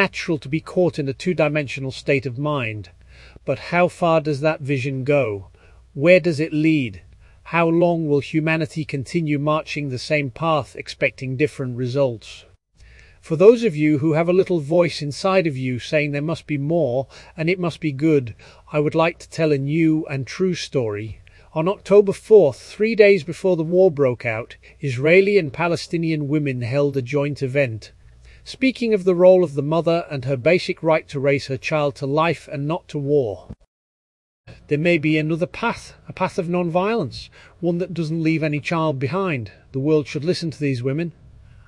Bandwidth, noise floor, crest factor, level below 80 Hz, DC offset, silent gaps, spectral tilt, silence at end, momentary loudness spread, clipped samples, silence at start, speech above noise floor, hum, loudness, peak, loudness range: 11.5 kHz; -49 dBFS; 20 dB; -52 dBFS; under 0.1%; 33.67-34.44 s; -7 dB/octave; 0.55 s; 12 LU; under 0.1%; 0 s; 30 dB; none; -20 LUFS; 0 dBFS; 5 LU